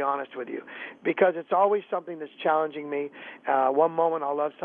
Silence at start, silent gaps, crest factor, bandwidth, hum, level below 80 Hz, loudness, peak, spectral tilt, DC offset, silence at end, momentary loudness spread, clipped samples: 0 s; none; 20 dB; 4.1 kHz; none; -84 dBFS; -26 LUFS; -6 dBFS; -8.5 dB/octave; under 0.1%; 0 s; 13 LU; under 0.1%